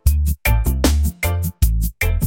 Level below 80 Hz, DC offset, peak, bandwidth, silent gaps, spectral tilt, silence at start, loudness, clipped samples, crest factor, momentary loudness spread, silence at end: -20 dBFS; under 0.1%; -2 dBFS; 17 kHz; none; -5 dB/octave; 0.05 s; -19 LUFS; under 0.1%; 16 dB; 3 LU; 0 s